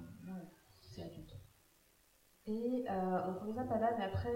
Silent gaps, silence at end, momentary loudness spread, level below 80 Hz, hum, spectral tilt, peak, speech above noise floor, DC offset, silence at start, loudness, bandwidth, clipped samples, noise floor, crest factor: none; 0 s; 20 LU; -64 dBFS; none; -7.5 dB/octave; -22 dBFS; 33 dB; under 0.1%; 0 s; -40 LUFS; 16 kHz; under 0.1%; -71 dBFS; 18 dB